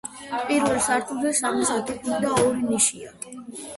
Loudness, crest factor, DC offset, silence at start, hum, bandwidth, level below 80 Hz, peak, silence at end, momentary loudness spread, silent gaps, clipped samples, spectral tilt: -23 LUFS; 18 dB; under 0.1%; 0.05 s; none; 12 kHz; -56 dBFS; -6 dBFS; 0 s; 16 LU; none; under 0.1%; -3 dB/octave